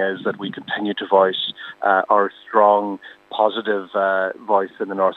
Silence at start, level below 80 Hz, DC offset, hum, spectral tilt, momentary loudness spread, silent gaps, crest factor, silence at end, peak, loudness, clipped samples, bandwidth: 0 s; -78 dBFS; under 0.1%; none; -6.5 dB/octave; 10 LU; none; 18 dB; 0 s; -2 dBFS; -20 LUFS; under 0.1%; 4.7 kHz